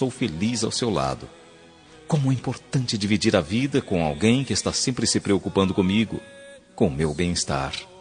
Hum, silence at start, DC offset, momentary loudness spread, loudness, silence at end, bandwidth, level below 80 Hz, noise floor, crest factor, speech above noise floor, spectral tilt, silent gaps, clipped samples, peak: none; 0 s; under 0.1%; 8 LU; -23 LUFS; 0 s; 10 kHz; -48 dBFS; -49 dBFS; 22 dB; 26 dB; -5 dB/octave; none; under 0.1%; -2 dBFS